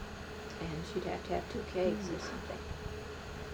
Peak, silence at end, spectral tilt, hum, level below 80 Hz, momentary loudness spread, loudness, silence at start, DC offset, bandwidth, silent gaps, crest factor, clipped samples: -20 dBFS; 0 s; -5.5 dB/octave; none; -50 dBFS; 10 LU; -39 LUFS; 0 s; under 0.1%; over 20 kHz; none; 18 dB; under 0.1%